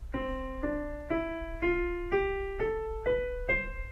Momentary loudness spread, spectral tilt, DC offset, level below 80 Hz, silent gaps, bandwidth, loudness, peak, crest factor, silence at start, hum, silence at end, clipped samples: 5 LU; -7.5 dB/octave; under 0.1%; -40 dBFS; none; 9.6 kHz; -33 LUFS; -16 dBFS; 16 dB; 0 s; none; 0 s; under 0.1%